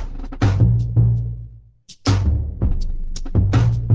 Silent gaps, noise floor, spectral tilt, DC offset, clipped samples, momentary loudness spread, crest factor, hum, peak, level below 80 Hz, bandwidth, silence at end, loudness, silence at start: none; -45 dBFS; -7.5 dB/octave; under 0.1%; under 0.1%; 14 LU; 14 dB; none; -4 dBFS; -24 dBFS; 8 kHz; 0 s; -19 LUFS; 0 s